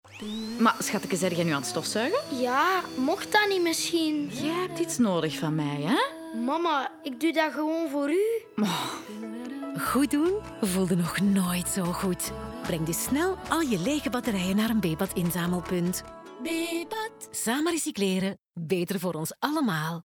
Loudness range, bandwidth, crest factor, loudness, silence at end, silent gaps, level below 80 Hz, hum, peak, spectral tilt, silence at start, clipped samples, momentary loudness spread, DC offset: 3 LU; over 20 kHz; 18 dB; -28 LUFS; 0.05 s; none; -54 dBFS; none; -10 dBFS; -4.5 dB/octave; 0.05 s; under 0.1%; 8 LU; under 0.1%